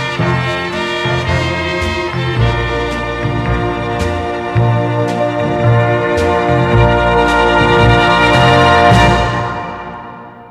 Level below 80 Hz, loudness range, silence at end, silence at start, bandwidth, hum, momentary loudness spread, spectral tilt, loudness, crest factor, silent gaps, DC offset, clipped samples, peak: -26 dBFS; 6 LU; 0 s; 0 s; 11.5 kHz; none; 10 LU; -6 dB/octave; -12 LUFS; 12 dB; none; under 0.1%; under 0.1%; 0 dBFS